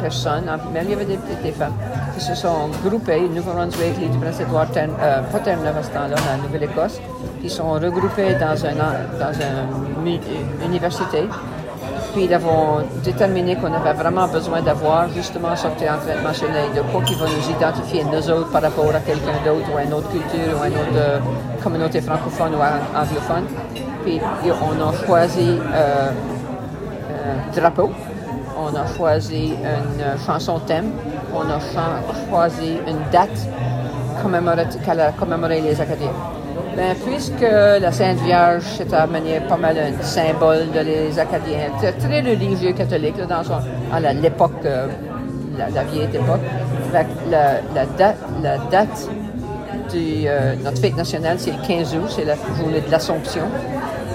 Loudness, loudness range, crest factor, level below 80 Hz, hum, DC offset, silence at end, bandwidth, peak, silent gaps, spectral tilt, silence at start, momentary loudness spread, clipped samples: -20 LUFS; 4 LU; 18 dB; -40 dBFS; none; under 0.1%; 0 s; 16 kHz; 0 dBFS; none; -6.5 dB/octave; 0 s; 8 LU; under 0.1%